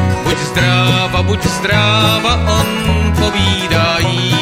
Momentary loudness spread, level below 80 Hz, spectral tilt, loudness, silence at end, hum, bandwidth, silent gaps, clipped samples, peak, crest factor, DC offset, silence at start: 4 LU; -26 dBFS; -4.5 dB/octave; -13 LUFS; 0 s; none; 16 kHz; none; under 0.1%; 0 dBFS; 12 dB; under 0.1%; 0 s